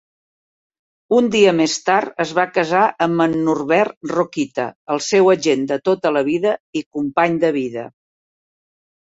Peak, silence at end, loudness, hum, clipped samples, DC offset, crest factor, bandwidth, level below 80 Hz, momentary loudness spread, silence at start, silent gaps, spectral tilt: -2 dBFS; 1.2 s; -18 LUFS; none; under 0.1%; under 0.1%; 16 dB; 8 kHz; -62 dBFS; 9 LU; 1.1 s; 3.97-4.01 s, 4.75-4.87 s, 6.60-6.73 s, 6.86-6.91 s; -4.5 dB/octave